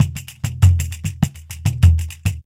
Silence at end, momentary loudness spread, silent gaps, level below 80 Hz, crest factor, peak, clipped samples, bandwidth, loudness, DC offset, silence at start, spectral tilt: 0.05 s; 10 LU; none; -26 dBFS; 18 dB; 0 dBFS; under 0.1%; 16 kHz; -19 LUFS; under 0.1%; 0 s; -5.5 dB/octave